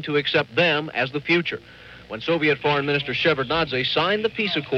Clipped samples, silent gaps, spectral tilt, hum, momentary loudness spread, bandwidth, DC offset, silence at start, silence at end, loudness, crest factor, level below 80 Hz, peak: under 0.1%; none; -6 dB/octave; none; 5 LU; 7.8 kHz; under 0.1%; 0 s; 0 s; -21 LUFS; 16 dB; -54 dBFS; -6 dBFS